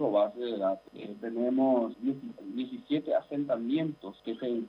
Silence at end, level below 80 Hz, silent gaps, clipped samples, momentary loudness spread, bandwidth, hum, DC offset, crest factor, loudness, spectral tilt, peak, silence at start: 0 s; -76 dBFS; none; under 0.1%; 12 LU; 5.2 kHz; none; under 0.1%; 16 dB; -32 LUFS; -8.5 dB/octave; -16 dBFS; 0 s